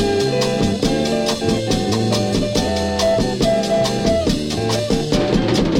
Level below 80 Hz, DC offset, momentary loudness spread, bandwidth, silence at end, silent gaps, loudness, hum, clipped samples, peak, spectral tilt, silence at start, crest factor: -32 dBFS; under 0.1%; 2 LU; 16.5 kHz; 0 s; none; -18 LUFS; none; under 0.1%; -4 dBFS; -5 dB/octave; 0 s; 14 dB